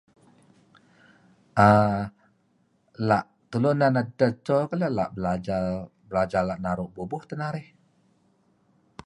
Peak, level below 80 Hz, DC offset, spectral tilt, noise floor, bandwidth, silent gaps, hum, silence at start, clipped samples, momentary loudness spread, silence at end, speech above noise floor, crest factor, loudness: -4 dBFS; -54 dBFS; under 0.1%; -8 dB/octave; -67 dBFS; 11 kHz; none; none; 1.55 s; under 0.1%; 13 LU; 1.45 s; 43 dB; 24 dB; -25 LUFS